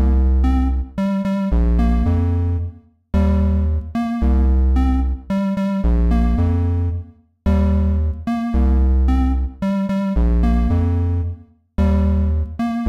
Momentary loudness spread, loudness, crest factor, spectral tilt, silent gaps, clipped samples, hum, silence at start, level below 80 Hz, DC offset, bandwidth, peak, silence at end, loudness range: 6 LU; -19 LUFS; 8 dB; -9.5 dB/octave; none; under 0.1%; none; 0 s; -18 dBFS; under 0.1%; 5.2 kHz; -8 dBFS; 0 s; 1 LU